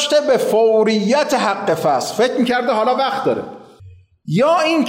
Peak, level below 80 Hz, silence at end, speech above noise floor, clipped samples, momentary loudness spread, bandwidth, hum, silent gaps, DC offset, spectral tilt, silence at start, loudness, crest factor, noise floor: -6 dBFS; -62 dBFS; 0 s; 27 dB; under 0.1%; 7 LU; 16 kHz; none; none; under 0.1%; -4.5 dB/octave; 0 s; -16 LUFS; 10 dB; -43 dBFS